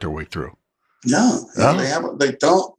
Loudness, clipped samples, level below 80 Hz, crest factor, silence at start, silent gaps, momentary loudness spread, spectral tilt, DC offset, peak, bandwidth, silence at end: -19 LUFS; under 0.1%; -46 dBFS; 18 dB; 0 s; none; 13 LU; -4.5 dB/octave; under 0.1%; -2 dBFS; 11 kHz; 0.1 s